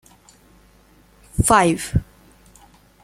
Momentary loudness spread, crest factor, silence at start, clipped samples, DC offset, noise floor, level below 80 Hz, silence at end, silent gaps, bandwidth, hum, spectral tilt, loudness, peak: 11 LU; 22 dB; 1.35 s; under 0.1%; under 0.1%; -53 dBFS; -36 dBFS; 1 s; none; 16 kHz; none; -4.5 dB/octave; -18 LUFS; -2 dBFS